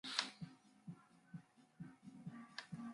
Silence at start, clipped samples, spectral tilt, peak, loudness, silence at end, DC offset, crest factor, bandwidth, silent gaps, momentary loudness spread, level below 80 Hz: 0.05 s; under 0.1%; -3 dB/octave; -16 dBFS; -52 LUFS; 0 s; under 0.1%; 36 dB; 11.5 kHz; none; 15 LU; -84 dBFS